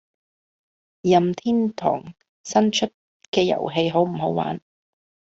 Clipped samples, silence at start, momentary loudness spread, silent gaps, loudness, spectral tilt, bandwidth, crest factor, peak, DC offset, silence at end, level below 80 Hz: under 0.1%; 1.05 s; 10 LU; 2.29-2.44 s, 2.94-3.20 s, 3.28-3.33 s; -22 LUFS; -5.5 dB/octave; 8 kHz; 20 dB; -4 dBFS; under 0.1%; 0.7 s; -62 dBFS